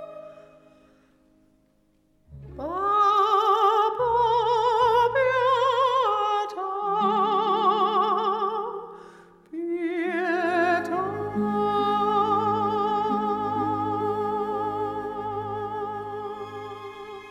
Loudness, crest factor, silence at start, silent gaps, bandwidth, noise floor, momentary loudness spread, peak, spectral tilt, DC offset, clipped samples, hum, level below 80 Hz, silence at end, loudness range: -24 LUFS; 16 dB; 0 s; none; 13 kHz; -64 dBFS; 14 LU; -8 dBFS; -5.5 dB/octave; under 0.1%; under 0.1%; none; -58 dBFS; 0 s; 7 LU